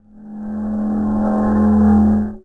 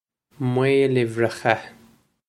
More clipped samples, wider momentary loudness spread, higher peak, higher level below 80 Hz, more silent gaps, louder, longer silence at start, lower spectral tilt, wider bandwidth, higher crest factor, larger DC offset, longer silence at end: neither; first, 15 LU vs 7 LU; second, -4 dBFS vs 0 dBFS; first, -32 dBFS vs -64 dBFS; neither; first, -16 LUFS vs -21 LUFS; second, 0.15 s vs 0.4 s; first, -11 dB/octave vs -6.5 dB/octave; second, 2 kHz vs 12.5 kHz; second, 12 dB vs 22 dB; neither; second, 0.05 s vs 0.6 s